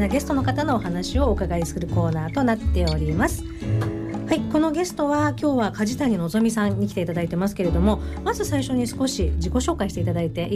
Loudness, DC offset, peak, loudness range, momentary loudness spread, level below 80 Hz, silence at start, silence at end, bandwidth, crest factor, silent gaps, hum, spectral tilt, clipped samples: -23 LUFS; under 0.1%; -8 dBFS; 1 LU; 4 LU; -32 dBFS; 0 s; 0 s; 15.5 kHz; 14 dB; none; none; -6 dB/octave; under 0.1%